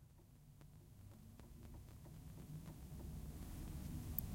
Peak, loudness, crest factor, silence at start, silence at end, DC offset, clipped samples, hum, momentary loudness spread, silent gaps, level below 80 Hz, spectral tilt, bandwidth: -18 dBFS; -54 LUFS; 34 dB; 0 s; 0 s; under 0.1%; under 0.1%; none; 14 LU; none; -58 dBFS; -6 dB/octave; 16.5 kHz